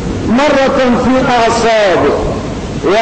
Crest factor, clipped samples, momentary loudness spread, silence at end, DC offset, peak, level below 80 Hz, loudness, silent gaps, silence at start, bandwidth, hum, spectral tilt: 8 dB; under 0.1%; 8 LU; 0 s; under 0.1%; -2 dBFS; -28 dBFS; -11 LUFS; none; 0 s; 9.2 kHz; none; -5 dB/octave